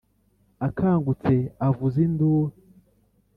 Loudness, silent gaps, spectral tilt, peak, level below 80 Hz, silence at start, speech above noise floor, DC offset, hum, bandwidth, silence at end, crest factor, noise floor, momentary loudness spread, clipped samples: -24 LUFS; none; -11.5 dB/octave; -10 dBFS; -52 dBFS; 0.6 s; 42 dB; under 0.1%; none; 4.6 kHz; 0.85 s; 16 dB; -64 dBFS; 8 LU; under 0.1%